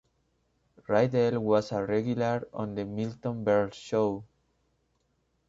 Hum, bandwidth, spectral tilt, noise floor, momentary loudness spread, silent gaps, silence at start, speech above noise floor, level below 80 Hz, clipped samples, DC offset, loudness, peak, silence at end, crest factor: none; 7.8 kHz; -7.5 dB/octave; -74 dBFS; 9 LU; none; 0.9 s; 46 dB; -64 dBFS; under 0.1%; under 0.1%; -29 LUFS; -10 dBFS; 1.25 s; 20 dB